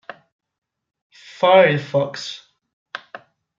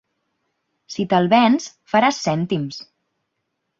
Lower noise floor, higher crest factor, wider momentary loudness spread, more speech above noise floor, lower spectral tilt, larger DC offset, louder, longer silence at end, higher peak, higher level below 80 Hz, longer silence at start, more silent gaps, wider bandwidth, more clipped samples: second, -43 dBFS vs -76 dBFS; about the same, 20 dB vs 20 dB; first, 23 LU vs 15 LU; second, 27 dB vs 57 dB; about the same, -5.5 dB/octave vs -5.5 dB/octave; neither; about the same, -17 LUFS vs -19 LUFS; second, 0.4 s vs 0.95 s; about the same, -2 dBFS vs -2 dBFS; second, -70 dBFS vs -62 dBFS; first, 1.4 s vs 0.9 s; first, 2.73-2.86 s vs none; about the same, 7.6 kHz vs 7.6 kHz; neither